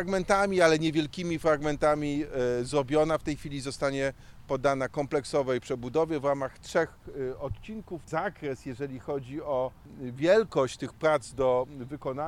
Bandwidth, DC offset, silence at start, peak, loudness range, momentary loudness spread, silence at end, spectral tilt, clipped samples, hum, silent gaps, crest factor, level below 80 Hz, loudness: 14 kHz; under 0.1%; 0 s; -8 dBFS; 7 LU; 13 LU; 0 s; -5.5 dB/octave; under 0.1%; none; none; 20 dB; -50 dBFS; -29 LUFS